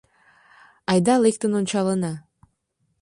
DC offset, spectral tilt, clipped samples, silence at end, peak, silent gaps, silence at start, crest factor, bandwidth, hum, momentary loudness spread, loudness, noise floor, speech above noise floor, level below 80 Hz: under 0.1%; -5.5 dB/octave; under 0.1%; 0.8 s; -6 dBFS; none; 0.9 s; 18 dB; 11.5 kHz; none; 13 LU; -21 LUFS; -72 dBFS; 52 dB; -62 dBFS